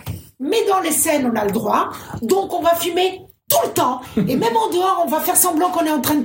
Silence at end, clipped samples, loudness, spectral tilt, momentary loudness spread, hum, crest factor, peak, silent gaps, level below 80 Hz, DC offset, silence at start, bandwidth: 0 s; under 0.1%; -18 LUFS; -3.5 dB/octave; 6 LU; none; 18 dB; 0 dBFS; none; -52 dBFS; under 0.1%; 0.05 s; 16.5 kHz